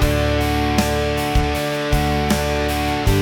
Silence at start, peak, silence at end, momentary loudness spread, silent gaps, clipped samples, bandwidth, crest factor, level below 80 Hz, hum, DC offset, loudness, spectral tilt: 0 s; -6 dBFS; 0 s; 2 LU; none; under 0.1%; 19.5 kHz; 12 dB; -24 dBFS; none; under 0.1%; -19 LUFS; -5 dB/octave